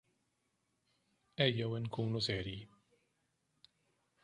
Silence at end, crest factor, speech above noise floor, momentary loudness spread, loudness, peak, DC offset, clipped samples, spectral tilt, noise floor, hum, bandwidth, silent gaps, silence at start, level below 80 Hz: 1.6 s; 26 dB; 45 dB; 15 LU; -37 LUFS; -16 dBFS; under 0.1%; under 0.1%; -6 dB/octave; -82 dBFS; none; 10.5 kHz; none; 1.4 s; -66 dBFS